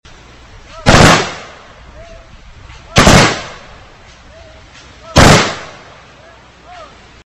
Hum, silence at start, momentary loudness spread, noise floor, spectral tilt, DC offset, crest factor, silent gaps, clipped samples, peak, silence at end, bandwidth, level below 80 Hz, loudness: none; 0.75 s; 22 LU; -40 dBFS; -4 dB/octave; under 0.1%; 14 dB; none; 0.4%; 0 dBFS; 0.45 s; 16 kHz; -26 dBFS; -9 LUFS